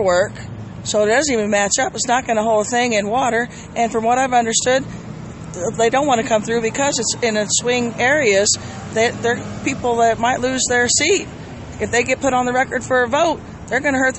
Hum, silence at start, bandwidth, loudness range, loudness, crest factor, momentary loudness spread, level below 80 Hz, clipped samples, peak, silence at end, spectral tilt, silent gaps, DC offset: none; 0 s; 8.6 kHz; 2 LU; -17 LUFS; 16 dB; 10 LU; -44 dBFS; under 0.1%; -2 dBFS; 0 s; -3 dB/octave; none; under 0.1%